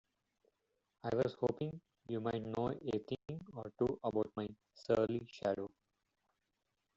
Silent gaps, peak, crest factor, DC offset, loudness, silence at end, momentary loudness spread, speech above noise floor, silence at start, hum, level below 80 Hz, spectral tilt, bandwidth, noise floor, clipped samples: none; -20 dBFS; 20 dB; under 0.1%; -40 LUFS; 1.3 s; 12 LU; 47 dB; 1.05 s; none; -70 dBFS; -6.5 dB/octave; 7.8 kHz; -86 dBFS; under 0.1%